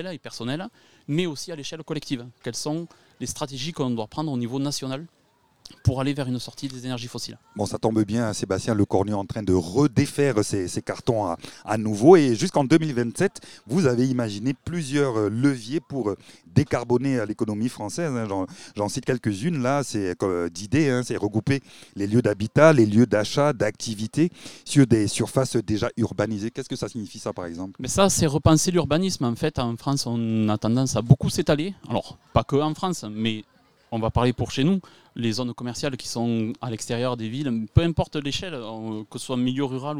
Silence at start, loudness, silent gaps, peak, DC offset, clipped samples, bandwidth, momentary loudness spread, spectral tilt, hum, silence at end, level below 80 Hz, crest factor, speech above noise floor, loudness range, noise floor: 0 s; -24 LUFS; none; -2 dBFS; 0.3%; under 0.1%; 16 kHz; 13 LU; -5.5 dB/octave; none; 0 s; -48 dBFS; 22 dB; 29 dB; 8 LU; -53 dBFS